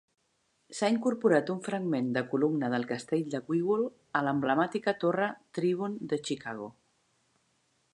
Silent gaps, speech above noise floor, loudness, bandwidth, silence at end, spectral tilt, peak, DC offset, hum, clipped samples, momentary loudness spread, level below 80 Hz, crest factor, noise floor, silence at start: none; 45 dB; -30 LUFS; 11 kHz; 1.25 s; -6 dB/octave; -10 dBFS; under 0.1%; none; under 0.1%; 7 LU; -78 dBFS; 20 dB; -74 dBFS; 0.7 s